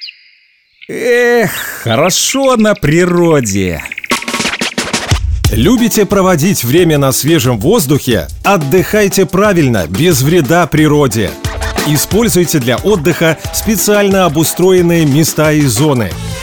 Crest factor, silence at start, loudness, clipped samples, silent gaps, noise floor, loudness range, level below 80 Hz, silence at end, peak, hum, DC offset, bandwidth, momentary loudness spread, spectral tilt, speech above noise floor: 10 dB; 0 s; -10 LUFS; under 0.1%; none; -50 dBFS; 2 LU; -28 dBFS; 0 s; -2 dBFS; none; 0.4%; over 20 kHz; 6 LU; -4.5 dB/octave; 40 dB